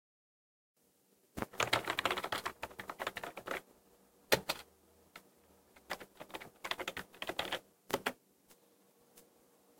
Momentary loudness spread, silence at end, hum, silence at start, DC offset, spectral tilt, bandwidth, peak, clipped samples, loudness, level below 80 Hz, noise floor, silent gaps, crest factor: 18 LU; 0.6 s; none; 1.35 s; under 0.1%; -2.5 dB/octave; 17 kHz; -12 dBFS; under 0.1%; -39 LUFS; -68 dBFS; -72 dBFS; none; 30 dB